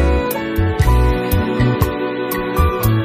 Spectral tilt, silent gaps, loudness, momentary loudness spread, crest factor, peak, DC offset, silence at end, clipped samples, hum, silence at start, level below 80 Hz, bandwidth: -6.5 dB/octave; none; -17 LUFS; 5 LU; 14 dB; -2 dBFS; under 0.1%; 0 s; under 0.1%; none; 0 s; -20 dBFS; 15.5 kHz